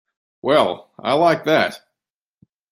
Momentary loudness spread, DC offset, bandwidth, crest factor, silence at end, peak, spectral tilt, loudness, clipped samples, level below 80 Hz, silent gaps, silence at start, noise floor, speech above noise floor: 9 LU; under 0.1%; 14.5 kHz; 18 dB; 0.95 s; -2 dBFS; -5.5 dB/octave; -18 LUFS; under 0.1%; -64 dBFS; none; 0.45 s; -88 dBFS; 70 dB